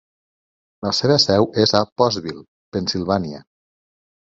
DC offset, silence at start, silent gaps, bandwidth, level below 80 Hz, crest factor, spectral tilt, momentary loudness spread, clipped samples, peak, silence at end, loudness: under 0.1%; 0.8 s; 1.92-1.96 s, 2.48-2.72 s; 7.8 kHz; -50 dBFS; 20 dB; -5 dB/octave; 17 LU; under 0.1%; -2 dBFS; 0.85 s; -19 LUFS